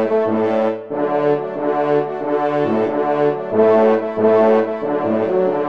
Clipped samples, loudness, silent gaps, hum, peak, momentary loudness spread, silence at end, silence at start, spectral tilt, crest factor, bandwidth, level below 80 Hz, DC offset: under 0.1%; -17 LUFS; none; none; -2 dBFS; 7 LU; 0 s; 0 s; -8.5 dB/octave; 14 dB; 6 kHz; -66 dBFS; 0.3%